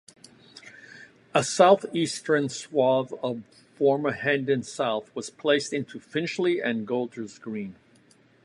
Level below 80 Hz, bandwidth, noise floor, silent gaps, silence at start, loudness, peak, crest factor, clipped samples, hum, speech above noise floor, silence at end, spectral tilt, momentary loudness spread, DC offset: -72 dBFS; 11.5 kHz; -59 dBFS; none; 0.55 s; -26 LUFS; -4 dBFS; 22 dB; under 0.1%; none; 34 dB; 0.75 s; -4.5 dB/octave; 16 LU; under 0.1%